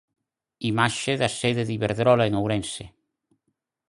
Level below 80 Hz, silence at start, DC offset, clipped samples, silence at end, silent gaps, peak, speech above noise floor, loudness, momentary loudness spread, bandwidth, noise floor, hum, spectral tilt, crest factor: -54 dBFS; 0.6 s; under 0.1%; under 0.1%; 1.05 s; none; -4 dBFS; 54 dB; -24 LUFS; 10 LU; 11.5 kHz; -77 dBFS; none; -5 dB/octave; 22 dB